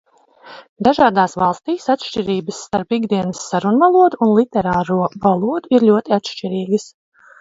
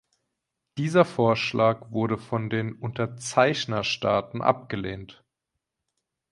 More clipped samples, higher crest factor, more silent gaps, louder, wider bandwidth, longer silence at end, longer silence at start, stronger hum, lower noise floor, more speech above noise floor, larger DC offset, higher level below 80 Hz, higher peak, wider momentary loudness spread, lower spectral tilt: neither; second, 16 dB vs 22 dB; first, 0.69-0.76 s vs none; first, -17 LUFS vs -25 LUFS; second, 7.8 kHz vs 11.5 kHz; second, 0.55 s vs 1.2 s; second, 0.45 s vs 0.75 s; neither; second, -43 dBFS vs -84 dBFS; second, 27 dB vs 59 dB; neither; first, -52 dBFS vs -60 dBFS; first, 0 dBFS vs -4 dBFS; about the same, 9 LU vs 10 LU; about the same, -6 dB/octave vs -5.5 dB/octave